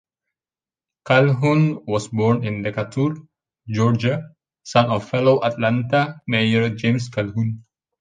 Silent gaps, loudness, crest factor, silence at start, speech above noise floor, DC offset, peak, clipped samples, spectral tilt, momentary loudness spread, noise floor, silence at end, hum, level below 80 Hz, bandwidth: none; -20 LUFS; 18 dB; 1.05 s; over 71 dB; under 0.1%; -2 dBFS; under 0.1%; -7 dB/octave; 8 LU; under -90 dBFS; 0.4 s; none; -56 dBFS; 9.4 kHz